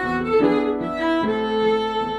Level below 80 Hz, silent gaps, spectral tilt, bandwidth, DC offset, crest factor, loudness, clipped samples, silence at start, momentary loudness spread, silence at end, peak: -48 dBFS; none; -6.5 dB/octave; 9.8 kHz; under 0.1%; 14 dB; -21 LUFS; under 0.1%; 0 s; 4 LU; 0 s; -6 dBFS